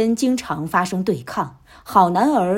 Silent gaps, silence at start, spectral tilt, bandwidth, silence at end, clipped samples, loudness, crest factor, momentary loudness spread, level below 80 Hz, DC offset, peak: none; 0 s; -6 dB/octave; 16.5 kHz; 0 s; under 0.1%; -19 LUFS; 18 dB; 10 LU; -54 dBFS; under 0.1%; 0 dBFS